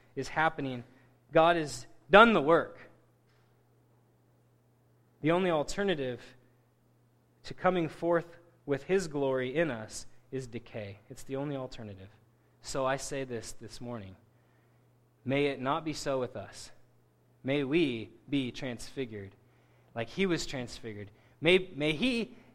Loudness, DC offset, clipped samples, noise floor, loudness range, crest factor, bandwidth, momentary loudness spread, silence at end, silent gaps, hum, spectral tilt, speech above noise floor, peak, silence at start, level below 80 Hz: -30 LUFS; under 0.1%; under 0.1%; -67 dBFS; 11 LU; 28 dB; 14 kHz; 19 LU; 0.15 s; none; none; -5 dB/octave; 36 dB; -4 dBFS; 0.15 s; -56 dBFS